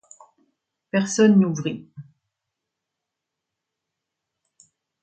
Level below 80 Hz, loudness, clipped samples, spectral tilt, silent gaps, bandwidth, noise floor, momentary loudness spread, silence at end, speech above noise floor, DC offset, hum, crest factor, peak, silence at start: -70 dBFS; -20 LUFS; under 0.1%; -6 dB/octave; none; 9 kHz; -84 dBFS; 14 LU; 3 s; 64 dB; under 0.1%; none; 20 dB; -6 dBFS; 0.95 s